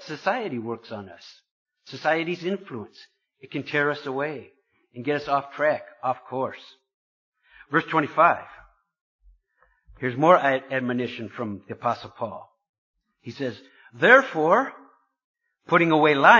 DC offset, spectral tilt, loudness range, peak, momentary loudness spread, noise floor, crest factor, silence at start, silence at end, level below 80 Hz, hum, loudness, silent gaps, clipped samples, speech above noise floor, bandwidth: under 0.1%; -6 dB/octave; 7 LU; 0 dBFS; 20 LU; -66 dBFS; 24 dB; 0 s; 0 s; -66 dBFS; none; -24 LUFS; 1.51-1.66 s, 6.94-7.32 s, 9.01-9.19 s, 12.69-12.94 s, 15.24-15.34 s; under 0.1%; 43 dB; 7.4 kHz